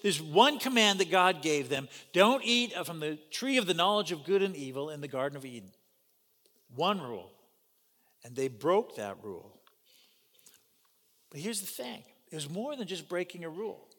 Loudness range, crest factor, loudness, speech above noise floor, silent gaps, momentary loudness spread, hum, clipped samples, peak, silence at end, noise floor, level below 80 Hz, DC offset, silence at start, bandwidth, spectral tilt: 13 LU; 24 dB; -30 LUFS; 40 dB; none; 20 LU; none; under 0.1%; -8 dBFS; 0.25 s; -71 dBFS; -88 dBFS; under 0.1%; 0.05 s; 19 kHz; -3.5 dB/octave